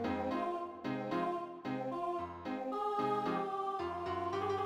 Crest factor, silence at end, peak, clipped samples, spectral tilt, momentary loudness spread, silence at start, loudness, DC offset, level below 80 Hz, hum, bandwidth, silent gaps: 14 dB; 0 s; -24 dBFS; under 0.1%; -7 dB/octave; 6 LU; 0 s; -38 LUFS; under 0.1%; -68 dBFS; none; 15 kHz; none